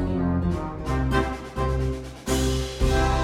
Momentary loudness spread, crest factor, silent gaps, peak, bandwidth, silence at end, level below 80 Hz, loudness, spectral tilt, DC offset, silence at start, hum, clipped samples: 6 LU; 16 dB; none; -8 dBFS; 16 kHz; 0 s; -28 dBFS; -26 LUFS; -6 dB/octave; under 0.1%; 0 s; none; under 0.1%